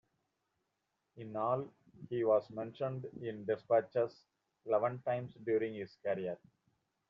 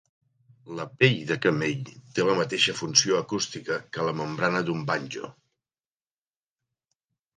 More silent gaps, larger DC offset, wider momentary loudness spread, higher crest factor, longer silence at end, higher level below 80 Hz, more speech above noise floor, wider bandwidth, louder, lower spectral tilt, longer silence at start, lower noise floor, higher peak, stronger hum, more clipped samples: neither; neither; second, 13 LU vs 16 LU; second, 20 dB vs 26 dB; second, 0.75 s vs 2.05 s; second, -80 dBFS vs -68 dBFS; second, 49 dB vs over 64 dB; second, 6 kHz vs 11 kHz; second, -37 LUFS vs -25 LUFS; first, -6.5 dB/octave vs -3.5 dB/octave; first, 1.15 s vs 0.65 s; second, -85 dBFS vs under -90 dBFS; second, -18 dBFS vs -2 dBFS; neither; neither